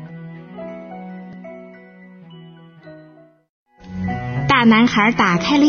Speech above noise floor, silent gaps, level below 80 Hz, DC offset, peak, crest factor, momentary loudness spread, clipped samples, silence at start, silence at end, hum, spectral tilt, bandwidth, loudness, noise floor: 34 dB; 3.49-3.66 s; -48 dBFS; under 0.1%; -2 dBFS; 18 dB; 23 LU; under 0.1%; 0 s; 0 s; none; -5.5 dB/octave; 6.8 kHz; -15 LUFS; -47 dBFS